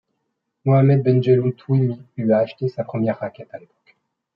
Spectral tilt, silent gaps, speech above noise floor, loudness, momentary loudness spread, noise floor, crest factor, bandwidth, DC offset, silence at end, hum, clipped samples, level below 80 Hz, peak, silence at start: -11 dB/octave; none; 57 dB; -19 LUFS; 15 LU; -75 dBFS; 16 dB; 5.4 kHz; under 0.1%; 0.75 s; none; under 0.1%; -66 dBFS; -4 dBFS; 0.65 s